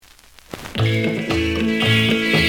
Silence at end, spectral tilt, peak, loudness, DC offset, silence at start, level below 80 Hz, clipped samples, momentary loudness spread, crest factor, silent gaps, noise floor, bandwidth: 0 s; -5.5 dB/octave; -4 dBFS; -18 LUFS; under 0.1%; 0.5 s; -42 dBFS; under 0.1%; 14 LU; 16 dB; none; -47 dBFS; 19 kHz